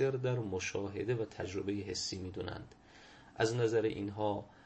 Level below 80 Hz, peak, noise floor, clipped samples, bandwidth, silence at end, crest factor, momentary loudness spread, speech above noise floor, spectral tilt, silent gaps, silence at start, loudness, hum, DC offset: -64 dBFS; -18 dBFS; -58 dBFS; under 0.1%; 8.4 kHz; 0.05 s; 18 dB; 16 LU; 22 dB; -5.5 dB/octave; none; 0 s; -37 LUFS; none; under 0.1%